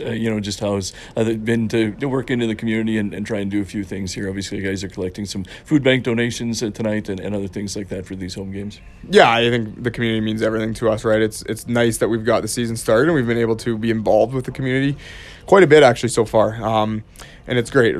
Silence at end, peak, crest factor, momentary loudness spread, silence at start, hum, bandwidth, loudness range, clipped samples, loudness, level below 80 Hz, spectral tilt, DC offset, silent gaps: 0 s; 0 dBFS; 18 dB; 13 LU; 0 s; none; 14 kHz; 6 LU; under 0.1%; -19 LUFS; -44 dBFS; -5.5 dB/octave; under 0.1%; none